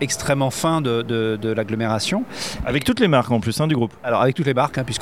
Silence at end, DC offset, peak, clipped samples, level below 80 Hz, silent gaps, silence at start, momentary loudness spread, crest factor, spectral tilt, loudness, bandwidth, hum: 0 s; 0.4%; -4 dBFS; under 0.1%; -44 dBFS; none; 0 s; 5 LU; 16 dB; -5 dB/octave; -20 LUFS; 16 kHz; none